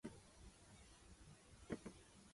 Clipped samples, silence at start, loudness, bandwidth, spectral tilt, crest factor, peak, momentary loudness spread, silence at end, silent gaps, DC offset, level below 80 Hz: under 0.1%; 0.05 s; -59 LUFS; 11.5 kHz; -5 dB/octave; 26 dB; -32 dBFS; 11 LU; 0 s; none; under 0.1%; -68 dBFS